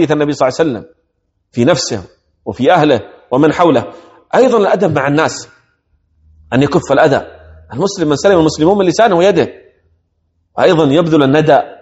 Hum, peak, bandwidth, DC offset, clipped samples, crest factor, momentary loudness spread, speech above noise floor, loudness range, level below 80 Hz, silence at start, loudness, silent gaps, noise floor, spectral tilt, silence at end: none; 0 dBFS; 8.2 kHz; under 0.1%; 0.2%; 12 dB; 14 LU; 54 dB; 3 LU; -46 dBFS; 0 s; -12 LUFS; none; -65 dBFS; -5.5 dB/octave; 0.1 s